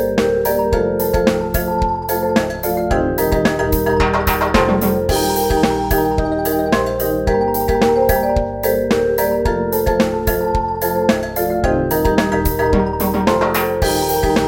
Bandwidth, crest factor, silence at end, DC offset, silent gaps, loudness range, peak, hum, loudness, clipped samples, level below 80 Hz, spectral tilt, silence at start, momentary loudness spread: 17 kHz; 16 dB; 0 s; under 0.1%; none; 1 LU; 0 dBFS; none; -17 LUFS; under 0.1%; -26 dBFS; -5.5 dB/octave; 0 s; 3 LU